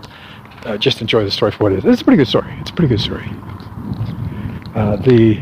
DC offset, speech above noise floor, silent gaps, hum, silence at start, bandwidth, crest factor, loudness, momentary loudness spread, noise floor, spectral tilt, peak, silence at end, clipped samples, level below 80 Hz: under 0.1%; 22 dB; none; none; 0 s; 15.5 kHz; 14 dB; -16 LUFS; 19 LU; -36 dBFS; -7 dB/octave; -2 dBFS; 0 s; under 0.1%; -38 dBFS